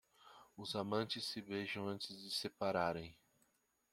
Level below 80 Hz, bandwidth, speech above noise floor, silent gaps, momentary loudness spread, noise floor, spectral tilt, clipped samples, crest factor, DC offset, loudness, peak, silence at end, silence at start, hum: -76 dBFS; 16.5 kHz; 37 dB; none; 13 LU; -79 dBFS; -4.5 dB/octave; under 0.1%; 22 dB; under 0.1%; -42 LUFS; -22 dBFS; 0.8 s; 0.2 s; none